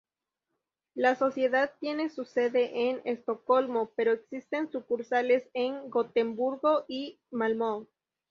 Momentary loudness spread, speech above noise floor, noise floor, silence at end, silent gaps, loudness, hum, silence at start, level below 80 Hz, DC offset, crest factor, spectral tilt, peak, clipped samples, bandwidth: 7 LU; 58 dB; -87 dBFS; 0.45 s; none; -29 LUFS; none; 0.95 s; -78 dBFS; under 0.1%; 20 dB; -5.5 dB/octave; -10 dBFS; under 0.1%; 7 kHz